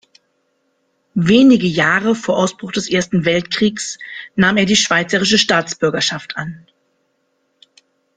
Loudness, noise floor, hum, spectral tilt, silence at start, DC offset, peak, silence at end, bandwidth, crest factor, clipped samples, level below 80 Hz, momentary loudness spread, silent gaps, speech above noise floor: -15 LUFS; -66 dBFS; none; -4 dB/octave; 1.15 s; under 0.1%; 0 dBFS; 1.6 s; 9.6 kHz; 16 dB; under 0.1%; -54 dBFS; 14 LU; none; 50 dB